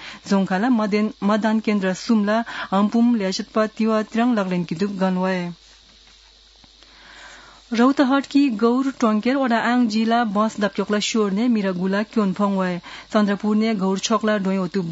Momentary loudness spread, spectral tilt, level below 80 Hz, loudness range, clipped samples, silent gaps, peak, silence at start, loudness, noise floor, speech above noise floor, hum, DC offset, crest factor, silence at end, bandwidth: 5 LU; -5.5 dB/octave; -60 dBFS; 5 LU; under 0.1%; none; -4 dBFS; 0 s; -20 LUFS; -50 dBFS; 31 dB; none; under 0.1%; 16 dB; 0 s; 8 kHz